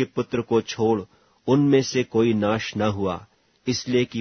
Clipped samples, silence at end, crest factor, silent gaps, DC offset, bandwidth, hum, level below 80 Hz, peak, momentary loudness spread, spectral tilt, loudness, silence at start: under 0.1%; 0 s; 16 dB; none; under 0.1%; 6.6 kHz; none; -56 dBFS; -6 dBFS; 9 LU; -6 dB/octave; -23 LUFS; 0 s